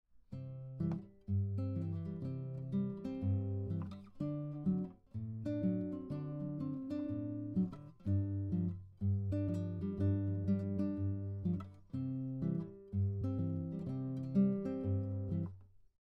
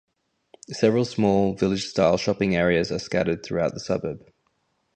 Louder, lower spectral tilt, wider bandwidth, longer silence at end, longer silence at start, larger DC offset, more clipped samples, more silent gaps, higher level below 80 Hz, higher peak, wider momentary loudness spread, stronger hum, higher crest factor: second, -39 LUFS vs -23 LUFS; first, -11.5 dB/octave vs -6 dB/octave; second, 4.5 kHz vs 9.2 kHz; second, 0.35 s vs 0.8 s; second, 0.15 s vs 0.7 s; neither; neither; neither; second, -64 dBFS vs -50 dBFS; second, -22 dBFS vs -4 dBFS; about the same, 7 LU vs 7 LU; neither; about the same, 18 dB vs 20 dB